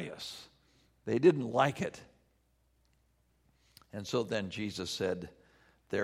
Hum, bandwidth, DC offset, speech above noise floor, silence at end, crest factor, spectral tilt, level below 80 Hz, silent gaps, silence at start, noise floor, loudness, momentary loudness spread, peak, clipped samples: none; 14.5 kHz; under 0.1%; 40 dB; 0 s; 24 dB; -5.5 dB/octave; -68 dBFS; none; 0 s; -72 dBFS; -33 LUFS; 20 LU; -12 dBFS; under 0.1%